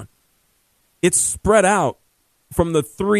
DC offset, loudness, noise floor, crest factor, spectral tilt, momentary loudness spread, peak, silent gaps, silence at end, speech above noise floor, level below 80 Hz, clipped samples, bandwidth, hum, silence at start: under 0.1%; -18 LUFS; -63 dBFS; 18 dB; -4 dB/octave; 8 LU; -2 dBFS; none; 0 s; 46 dB; -42 dBFS; under 0.1%; 14 kHz; none; 0 s